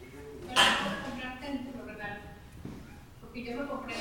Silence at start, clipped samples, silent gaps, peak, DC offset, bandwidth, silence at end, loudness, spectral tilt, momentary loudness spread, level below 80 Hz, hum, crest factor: 0 s; under 0.1%; none; -10 dBFS; under 0.1%; 18 kHz; 0 s; -31 LUFS; -2.5 dB/octave; 23 LU; -54 dBFS; none; 24 dB